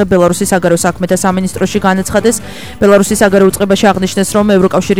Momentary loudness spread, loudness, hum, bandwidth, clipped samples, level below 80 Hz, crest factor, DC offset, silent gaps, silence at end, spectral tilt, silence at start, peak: 6 LU; -10 LUFS; none; 16.5 kHz; 0.4%; -36 dBFS; 10 dB; 2%; none; 0 s; -5 dB/octave; 0 s; 0 dBFS